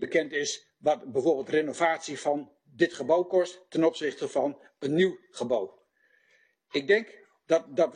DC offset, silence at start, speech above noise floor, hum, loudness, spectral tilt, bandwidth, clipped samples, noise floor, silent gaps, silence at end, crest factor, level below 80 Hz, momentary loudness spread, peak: under 0.1%; 0 s; 40 dB; none; -28 LUFS; -4.5 dB/octave; 10 kHz; under 0.1%; -67 dBFS; none; 0 s; 18 dB; -76 dBFS; 8 LU; -10 dBFS